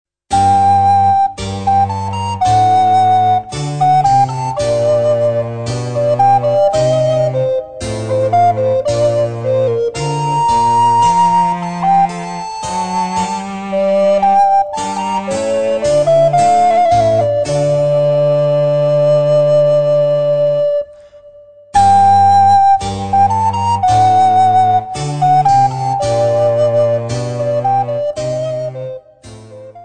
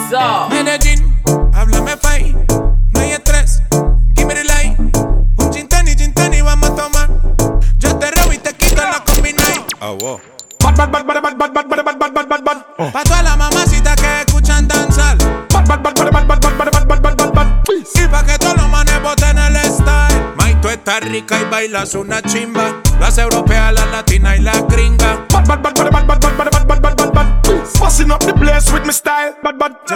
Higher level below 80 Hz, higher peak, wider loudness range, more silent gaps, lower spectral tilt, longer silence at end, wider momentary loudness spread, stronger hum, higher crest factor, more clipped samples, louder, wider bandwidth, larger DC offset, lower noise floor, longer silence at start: second, -42 dBFS vs -12 dBFS; about the same, 0 dBFS vs 0 dBFS; about the same, 3 LU vs 2 LU; neither; first, -6 dB/octave vs -4 dB/octave; about the same, 0 s vs 0 s; first, 9 LU vs 5 LU; neither; about the same, 12 dB vs 10 dB; neither; about the same, -13 LUFS vs -13 LUFS; second, 9.4 kHz vs 18.5 kHz; first, 0.9% vs under 0.1%; first, -40 dBFS vs -30 dBFS; first, 0.3 s vs 0 s